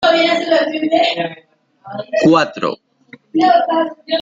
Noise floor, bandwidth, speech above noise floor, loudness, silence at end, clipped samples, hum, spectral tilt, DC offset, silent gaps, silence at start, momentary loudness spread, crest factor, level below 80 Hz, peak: -44 dBFS; 7.8 kHz; 29 dB; -15 LUFS; 0 s; under 0.1%; none; -5 dB/octave; under 0.1%; none; 0 s; 12 LU; 14 dB; -62 dBFS; -2 dBFS